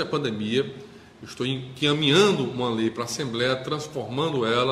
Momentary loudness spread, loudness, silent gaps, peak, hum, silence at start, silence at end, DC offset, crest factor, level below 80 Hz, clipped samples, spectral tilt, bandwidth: 12 LU; -24 LUFS; none; -6 dBFS; none; 0 s; 0 s; under 0.1%; 20 dB; -60 dBFS; under 0.1%; -4.5 dB/octave; 14.5 kHz